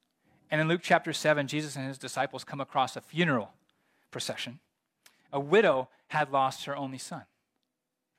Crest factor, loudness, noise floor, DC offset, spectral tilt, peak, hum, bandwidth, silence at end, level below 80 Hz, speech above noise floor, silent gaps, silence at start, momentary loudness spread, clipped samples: 24 dB; -30 LUFS; -84 dBFS; under 0.1%; -4.5 dB/octave; -8 dBFS; none; 16 kHz; 0.95 s; -78 dBFS; 55 dB; none; 0.5 s; 13 LU; under 0.1%